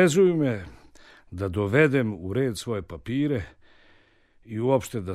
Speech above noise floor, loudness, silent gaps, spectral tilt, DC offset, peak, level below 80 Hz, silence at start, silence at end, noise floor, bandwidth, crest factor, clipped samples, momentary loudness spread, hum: 35 dB; -25 LUFS; none; -6.5 dB/octave; under 0.1%; -6 dBFS; -52 dBFS; 0 s; 0 s; -59 dBFS; 14.5 kHz; 20 dB; under 0.1%; 15 LU; none